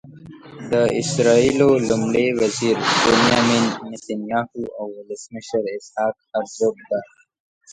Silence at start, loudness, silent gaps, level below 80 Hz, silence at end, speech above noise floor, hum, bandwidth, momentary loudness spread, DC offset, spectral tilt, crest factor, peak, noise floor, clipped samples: 0.05 s; -19 LUFS; 7.40-7.61 s; -52 dBFS; 0 s; 21 dB; none; 11 kHz; 15 LU; under 0.1%; -4.5 dB/octave; 18 dB; -2 dBFS; -41 dBFS; under 0.1%